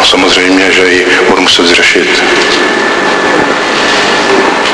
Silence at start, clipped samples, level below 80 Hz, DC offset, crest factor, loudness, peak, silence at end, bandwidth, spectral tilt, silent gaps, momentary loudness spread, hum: 0 s; 1%; -40 dBFS; under 0.1%; 8 dB; -6 LUFS; 0 dBFS; 0 s; 11 kHz; -2 dB/octave; none; 4 LU; none